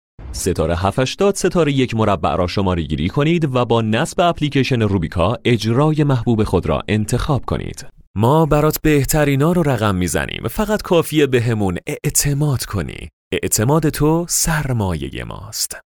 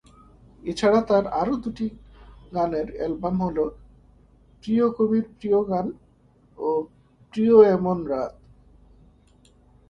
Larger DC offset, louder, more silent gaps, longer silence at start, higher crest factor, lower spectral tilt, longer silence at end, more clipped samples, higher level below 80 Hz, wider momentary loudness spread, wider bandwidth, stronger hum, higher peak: neither; first, -17 LUFS vs -23 LUFS; first, 8.07-8.14 s, 13.13-13.31 s vs none; second, 0.2 s vs 0.65 s; second, 16 dB vs 22 dB; second, -5 dB/octave vs -7.5 dB/octave; second, 0.15 s vs 1.6 s; neither; first, -34 dBFS vs -50 dBFS; second, 8 LU vs 15 LU; first, over 20 kHz vs 9.4 kHz; neither; about the same, 0 dBFS vs -2 dBFS